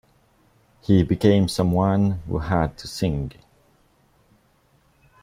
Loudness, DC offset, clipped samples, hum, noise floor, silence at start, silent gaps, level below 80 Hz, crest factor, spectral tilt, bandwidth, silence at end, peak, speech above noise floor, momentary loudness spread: -21 LUFS; under 0.1%; under 0.1%; none; -61 dBFS; 0.9 s; none; -42 dBFS; 20 dB; -7 dB/octave; 15 kHz; 1.95 s; -4 dBFS; 41 dB; 10 LU